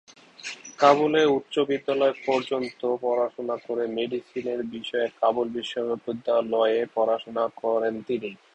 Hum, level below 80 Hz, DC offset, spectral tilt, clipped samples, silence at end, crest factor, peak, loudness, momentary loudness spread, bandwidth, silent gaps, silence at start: none; -70 dBFS; under 0.1%; -5 dB/octave; under 0.1%; 0.2 s; 22 dB; -4 dBFS; -25 LUFS; 10 LU; 8.8 kHz; none; 0.45 s